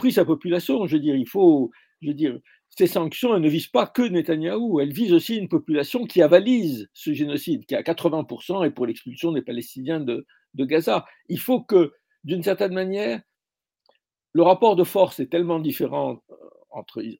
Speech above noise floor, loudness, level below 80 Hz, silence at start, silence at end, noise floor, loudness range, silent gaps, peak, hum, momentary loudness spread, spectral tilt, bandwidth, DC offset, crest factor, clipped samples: over 69 dB; -22 LUFS; -72 dBFS; 0 s; 0.05 s; under -90 dBFS; 5 LU; none; 0 dBFS; none; 13 LU; -6.5 dB/octave; 17 kHz; under 0.1%; 22 dB; under 0.1%